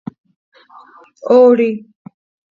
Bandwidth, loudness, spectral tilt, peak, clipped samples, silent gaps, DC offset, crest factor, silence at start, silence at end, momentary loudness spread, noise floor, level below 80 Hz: 6.6 kHz; -11 LUFS; -8 dB/octave; 0 dBFS; under 0.1%; none; under 0.1%; 16 dB; 1.25 s; 0.7 s; 22 LU; -43 dBFS; -70 dBFS